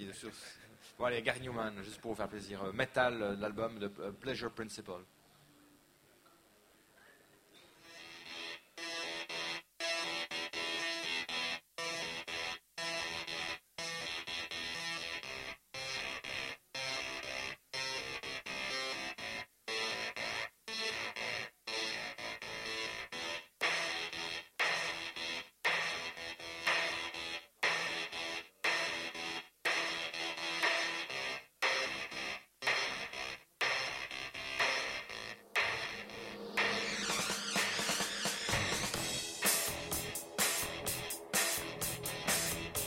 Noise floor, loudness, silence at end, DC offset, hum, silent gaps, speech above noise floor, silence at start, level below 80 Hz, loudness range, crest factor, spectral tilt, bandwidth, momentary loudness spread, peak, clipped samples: -67 dBFS; -37 LUFS; 0 s; under 0.1%; none; none; 28 dB; 0 s; -66 dBFS; 6 LU; 24 dB; -1.5 dB/octave; 16 kHz; 10 LU; -14 dBFS; under 0.1%